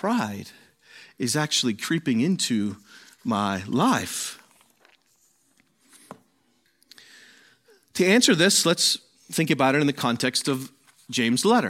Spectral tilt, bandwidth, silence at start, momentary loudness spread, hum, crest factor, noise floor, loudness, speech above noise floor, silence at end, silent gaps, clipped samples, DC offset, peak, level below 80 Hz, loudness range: -3.5 dB/octave; 16.5 kHz; 0.05 s; 14 LU; none; 20 dB; -67 dBFS; -23 LUFS; 44 dB; 0 s; none; under 0.1%; under 0.1%; -4 dBFS; -70 dBFS; 9 LU